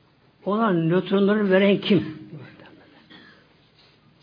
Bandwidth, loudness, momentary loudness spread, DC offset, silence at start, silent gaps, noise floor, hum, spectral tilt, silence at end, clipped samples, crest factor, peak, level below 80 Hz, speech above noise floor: 5.2 kHz; -21 LUFS; 20 LU; under 0.1%; 0.45 s; none; -57 dBFS; none; -9.5 dB/octave; 1.75 s; under 0.1%; 18 dB; -6 dBFS; -68 dBFS; 37 dB